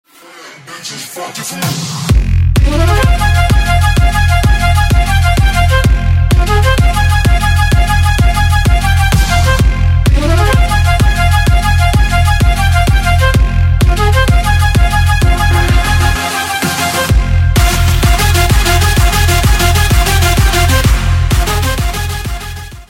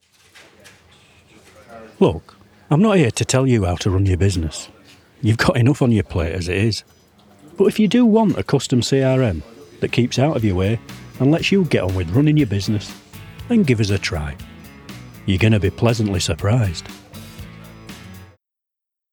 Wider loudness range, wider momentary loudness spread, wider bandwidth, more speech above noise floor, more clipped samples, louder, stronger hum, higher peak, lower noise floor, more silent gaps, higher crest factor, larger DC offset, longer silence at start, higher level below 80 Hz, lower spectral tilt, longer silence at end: about the same, 1 LU vs 3 LU; second, 5 LU vs 22 LU; second, 16.5 kHz vs 18.5 kHz; second, 21 dB vs 67 dB; neither; first, -11 LUFS vs -18 LUFS; neither; about the same, 0 dBFS vs 0 dBFS; second, -35 dBFS vs -84 dBFS; neither; second, 10 dB vs 18 dB; neither; second, 0.35 s vs 1.7 s; first, -12 dBFS vs -42 dBFS; second, -4.5 dB/octave vs -6 dB/octave; second, 0.05 s vs 0.85 s